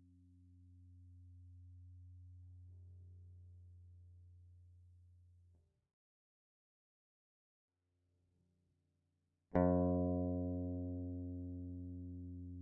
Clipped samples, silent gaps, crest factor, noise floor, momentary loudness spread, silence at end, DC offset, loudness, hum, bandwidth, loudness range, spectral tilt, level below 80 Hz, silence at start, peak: under 0.1%; 5.93-7.68 s; 24 dB; -85 dBFS; 27 LU; 0 s; under 0.1%; -40 LUFS; 50 Hz at -95 dBFS; 2 kHz; 22 LU; -8.5 dB/octave; -70 dBFS; 0.45 s; -20 dBFS